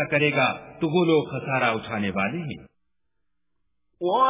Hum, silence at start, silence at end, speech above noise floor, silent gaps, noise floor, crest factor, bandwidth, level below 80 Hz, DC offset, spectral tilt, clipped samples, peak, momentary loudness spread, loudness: none; 0 s; 0 s; 57 dB; none; -80 dBFS; 18 dB; 3.9 kHz; -58 dBFS; under 0.1%; -10 dB/octave; under 0.1%; -6 dBFS; 11 LU; -24 LUFS